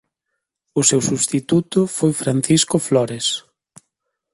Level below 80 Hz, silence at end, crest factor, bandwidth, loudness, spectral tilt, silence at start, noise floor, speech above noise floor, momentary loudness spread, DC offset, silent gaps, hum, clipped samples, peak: -56 dBFS; 0.95 s; 18 dB; 12 kHz; -18 LUFS; -4 dB/octave; 0.75 s; -78 dBFS; 60 dB; 6 LU; under 0.1%; none; none; under 0.1%; -2 dBFS